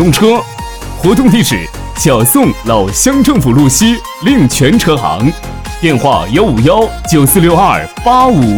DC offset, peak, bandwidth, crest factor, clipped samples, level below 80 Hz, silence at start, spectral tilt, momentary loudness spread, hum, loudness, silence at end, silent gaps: 0.3%; 0 dBFS; over 20 kHz; 8 dB; 0.4%; -26 dBFS; 0 s; -5 dB/octave; 7 LU; none; -9 LUFS; 0 s; none